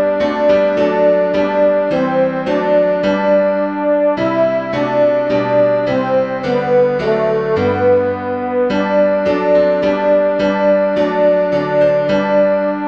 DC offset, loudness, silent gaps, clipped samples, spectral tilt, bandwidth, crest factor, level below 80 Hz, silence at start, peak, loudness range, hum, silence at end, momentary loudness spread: 0.3%; -14 LUFS; none; under 0.1%; -7.5 dB/octave; 6.6 kHz; 12 dB; -48 dBFS; 0 s; -2 dBFS; 1 LU; none; 0 s; 3 LU